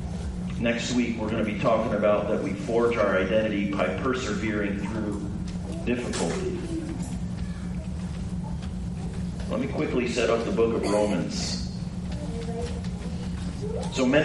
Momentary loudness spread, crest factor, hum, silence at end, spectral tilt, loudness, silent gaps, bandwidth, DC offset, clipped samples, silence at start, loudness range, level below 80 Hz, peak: 9 LU; 18 dB; none; 0 s; -6 dB/octave; -28 LUFS; none; 11.5 kHz; under 0.1%; under 0.1%; 0 s; 6 LU; -40 dBFS; -8 dBFS